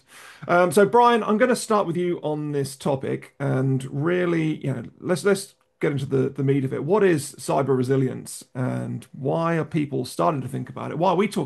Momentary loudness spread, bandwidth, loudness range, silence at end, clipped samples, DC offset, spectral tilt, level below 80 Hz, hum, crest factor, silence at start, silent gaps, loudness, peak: 11 LU; 12.5 kHz; 4 LU; 0 s; under 0.1%; under 0.1%; -6.5 dB/octave; -66 dBFS; none; 18 dB; 0.15 s; none; -23 LUFS; -6 dBFS